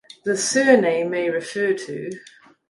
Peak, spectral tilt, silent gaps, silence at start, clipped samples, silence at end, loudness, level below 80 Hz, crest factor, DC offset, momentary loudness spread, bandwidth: -2 dBFS; -3.5 dB/octave; none; 0.25 s; under 0.1%; 0.5 s; -20 LUFS; -70 dBFS; 20 dB; under 0.1%; 16 LU; 11.5 kHz